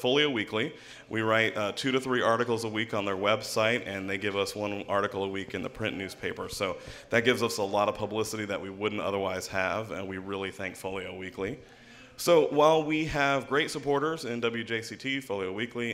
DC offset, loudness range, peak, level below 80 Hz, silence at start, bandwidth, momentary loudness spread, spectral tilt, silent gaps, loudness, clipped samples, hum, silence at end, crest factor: under 0.1%; 6 LU; -8 dBFS; -60 dBFS; 0 s; 16 kHz; 11 LU; -4.5 dB/octave; none; -29 LUFS; under 0.1%; none; 0 s; 20 dB